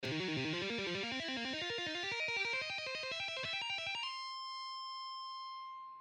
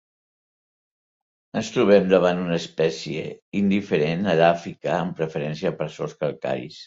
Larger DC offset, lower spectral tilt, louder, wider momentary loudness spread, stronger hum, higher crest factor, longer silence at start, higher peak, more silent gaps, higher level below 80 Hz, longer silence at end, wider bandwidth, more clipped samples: neither; second, -3.5 dB/octave vs -6.5 dB/octave; second, -39 LUFS vs -23 LUFS; second, 9 LU vs 12 LU; neither; second, 14 dB vs 20 dB; second, 0 s vs 1.55 s; second, -26 dBFS vs -4 dBFS; second, none vs 3.42-3.52 s; second, -76 dBFS vs -58 dBFS; about the same, 0 s vs 0 s; first, 12 kHz vs 7.8 kHz; neither